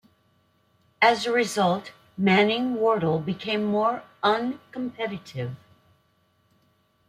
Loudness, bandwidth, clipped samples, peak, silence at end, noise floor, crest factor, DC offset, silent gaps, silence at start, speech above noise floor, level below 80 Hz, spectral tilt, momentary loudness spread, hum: -24 LUFS; 14.5 kHz; under 0.1%; -4 dBFS; 1.5 s; -66 dBFS; 22 dB; under 0.1%; none; 1 s; 42 dB; -68 dBFS; -5.5 dB/octave; 14 LU; none